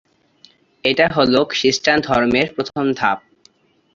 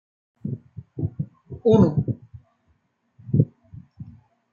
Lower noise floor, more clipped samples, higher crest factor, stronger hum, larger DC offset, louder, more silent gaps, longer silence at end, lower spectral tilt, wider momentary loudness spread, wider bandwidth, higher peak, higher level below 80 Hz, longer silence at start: second, -55 dBFS vs -67 dBFS; neither; about the same, 18 dB vs 22 dB; neither; neither; first, -17 LUFS vs -23 LUFS; neither; first, 0.75 s vs 0.4 s; second, -4 dB/octave vs -10.5 dB/octave; second, 6 LU vs 25 LU; first, 7.6 kHz vs 6.8 kHz; about the same, -2 dBFS vs -4 dBFS; about the same, -50 dBFS vs -52 dBFS; first, 0.85 s vs 0.45 s